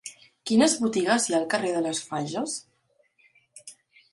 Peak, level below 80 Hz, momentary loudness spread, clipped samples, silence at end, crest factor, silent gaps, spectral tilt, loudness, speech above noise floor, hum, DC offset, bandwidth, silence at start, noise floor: -10 dBFS; -70 dBFS; 24 LU; under 0.1%; 0.4 s; 18 dB; none; -3.5 dB/octave; -25 LUFS; 43 dB; none; under 0.1%; 11.5 kHz; 0.05 s; -68 dBFS